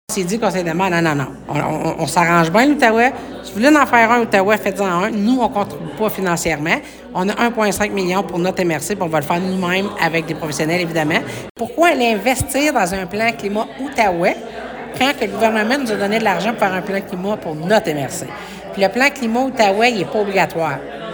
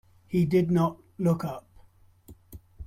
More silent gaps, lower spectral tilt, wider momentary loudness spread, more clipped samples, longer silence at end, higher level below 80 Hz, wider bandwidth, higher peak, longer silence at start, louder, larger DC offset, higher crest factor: first, 11.50-11.55 s vs none; second, -4.5 dB/octave vs -8.5 dB/octave; about the same, 10 LU vs 10 LU; neither; about the same, 0 s vs 0 s; first, -46 dBFS vs -54 dBFS; first, over 20 kHz vs 15 kHz; first, 0 dBFS vs -12 dBFS; second, 0.1 s vs 0.3 s; first, -17 LUFS vs -27 LUFS; neither; about the same, 16 dB vs 18 dB